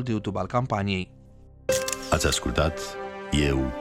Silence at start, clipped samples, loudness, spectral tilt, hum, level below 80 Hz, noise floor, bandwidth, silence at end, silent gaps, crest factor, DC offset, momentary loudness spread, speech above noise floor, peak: 0 s; under 0.1%; -26 LUFS; -4.5 dB/octave; none; -38 dBFS; -49 dBFS; 17 kHz; 0 s; none; 18 dB; under 0.1%; 11 LU; 24 dB; -8 dBFS